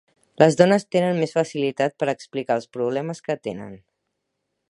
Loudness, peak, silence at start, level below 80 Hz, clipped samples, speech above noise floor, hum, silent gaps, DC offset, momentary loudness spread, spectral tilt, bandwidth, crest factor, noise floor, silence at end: -22 LUFS; 0 dBFS; 0.4 s; -68 dBFS; under 0.1%; 56 dB; none; none; under 0.1%; 12 LU; -6 dB/octave; 11 kHz; 22 dB; -78 dBFS; 0.95 s